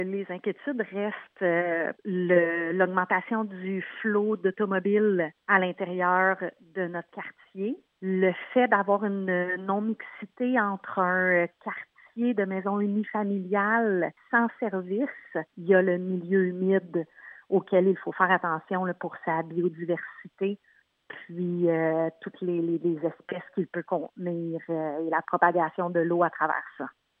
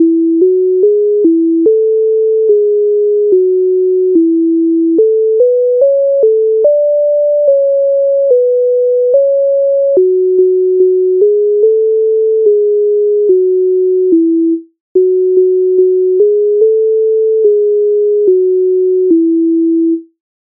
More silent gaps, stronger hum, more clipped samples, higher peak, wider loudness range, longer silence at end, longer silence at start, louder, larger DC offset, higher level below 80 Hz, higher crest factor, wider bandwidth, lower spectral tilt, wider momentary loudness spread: second, none vs 14.80-14.95 s; neither; neither; second, -6 dBFS vs 0 dBFS; first, 4 LU vs 1 LU; about the same, 0.3 s vs 0.4 s; about the same, 0 s vs 0 s; second, -27 LUFS vs -10 LUFS; neither; second, -86 dBFS vs -70 dBFS; first, 22 dB vs 8 dB; first, 3.8 kHz vs 0.9 kHz; about the same, -10 dB/octave vs -11 dB/octave; first, 11 LU vs 1 LU